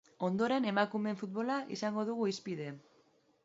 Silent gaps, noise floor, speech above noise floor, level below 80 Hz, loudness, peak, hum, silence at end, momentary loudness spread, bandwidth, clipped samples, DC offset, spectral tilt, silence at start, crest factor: none; -70 dBFS; 35 dB; -82 dBFS; -35 LUFS; -16 dBFS; none; 0.65 s; 10 LU; 7.6 kHz; under 0.1%; under 0.1%; -4.5 dB/octave; 0.2 s; 20 dB